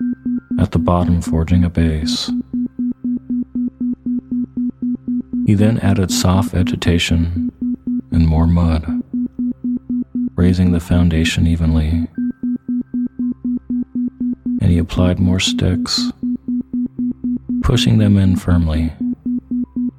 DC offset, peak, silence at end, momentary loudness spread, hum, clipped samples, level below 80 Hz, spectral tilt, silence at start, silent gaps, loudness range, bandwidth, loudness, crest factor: under 0.1%; 0 dBFS; 0.1 s; 9 LU; none; under 0.1%; -28 dBFS; -6 dB/octave; 0 s; none; 3 LU; 14.5 kHz; -17 LUFS; 16 dB